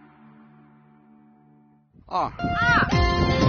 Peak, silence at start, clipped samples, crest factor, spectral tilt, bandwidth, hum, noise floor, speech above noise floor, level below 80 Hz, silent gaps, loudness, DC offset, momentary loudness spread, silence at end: -8 dBFS; 2.1 s; under 0.1%; 18 dB; -4 dB/octave; 6.8 kHz; none; -57 dBFS; 35 dB; -34 dBFS; none; -22 LUFS; under 0.1%; 9 LU; 0 s